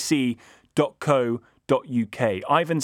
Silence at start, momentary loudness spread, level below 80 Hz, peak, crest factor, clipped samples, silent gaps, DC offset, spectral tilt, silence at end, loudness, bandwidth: 0 s; 7 LU; -66 dBFS; -6 dBFS; 18 dB; under 0.1%; none; under 0.1%; -5.5 dB/octave; 0 s; -24 LUFS; 17 kHz